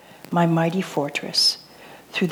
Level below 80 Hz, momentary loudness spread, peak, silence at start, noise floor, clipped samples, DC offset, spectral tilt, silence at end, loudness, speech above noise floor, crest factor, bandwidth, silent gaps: -70 dBFS; 10 LU; -8 dBFS; 0.25 s; -45 dBFS; under 0.1%; under 0.1%; -4.5 dB/octave; 0 s; -21 LUFS; 24 dB; 16 dB; 19.5 kHz; none